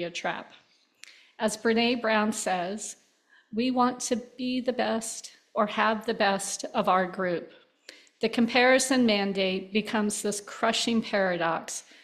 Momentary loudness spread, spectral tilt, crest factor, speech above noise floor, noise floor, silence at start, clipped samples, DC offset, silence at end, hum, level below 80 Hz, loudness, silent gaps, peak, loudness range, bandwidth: 11 LU; -3.5 dB/octave; 18 dB; 36 dB; -63 dBFS; 0 s; under 0.1%; under 0.1%; 0.2 s; none; -70 dBFS; -27 LUFS; none; -8 dBFS; 4 LU; 14.5 kHz